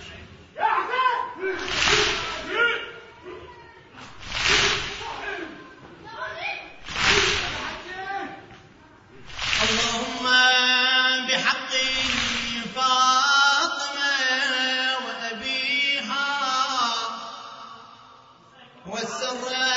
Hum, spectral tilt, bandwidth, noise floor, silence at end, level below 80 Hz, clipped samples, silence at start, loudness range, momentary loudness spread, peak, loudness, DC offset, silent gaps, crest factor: none; -1 dB/octave; 8 kHz; -51 dBFS; 0 s; -50 dBFS; under 0.1%; 0 s; 7 LU; 21 LU; -6 dBFS; -22 LUFS; under 0.1%; none; 20 dB